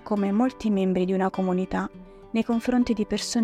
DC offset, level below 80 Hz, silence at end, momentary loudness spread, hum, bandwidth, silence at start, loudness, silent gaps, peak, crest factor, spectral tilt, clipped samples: under 0.1%; -50 dBFS; 0 s; 6 LU; none; 13 kHz; 0.05 s; -25 LUFS; none; -10 dBFS; 14 dB; -6 dB/octave; under 0.1%